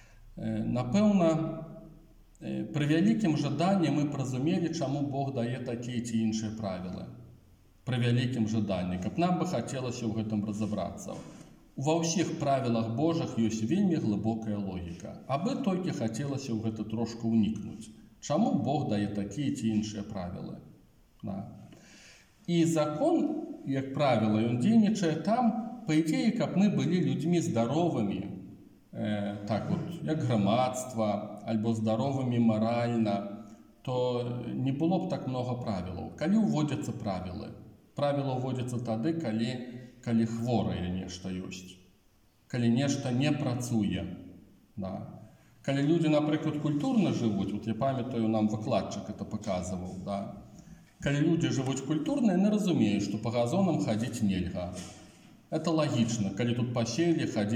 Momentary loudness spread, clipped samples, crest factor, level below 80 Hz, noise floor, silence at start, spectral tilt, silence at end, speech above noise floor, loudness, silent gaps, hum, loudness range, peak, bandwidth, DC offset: 13 LU; under 0.1%; 16 dB; -62 dBFS; -65 dBFS; 0.15 s; -6.5 dB/octave; 0 s; 36 dB; -30 LUFS; none; none; 5 LU; -14 dBFS; 12.5 kHz; under 0.1%